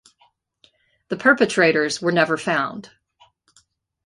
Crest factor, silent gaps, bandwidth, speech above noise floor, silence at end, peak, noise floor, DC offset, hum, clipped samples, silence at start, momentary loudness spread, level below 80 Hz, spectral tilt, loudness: 20 dB; none; 11.5 kHz; 43 dB; 1.2 s; -2 dBFS; -62 dBFS; under 0.1%; none; under 0.1%; 1.1 s; 13 LU; -66 dBFS; -4.5 dB/octave; -19 LUFS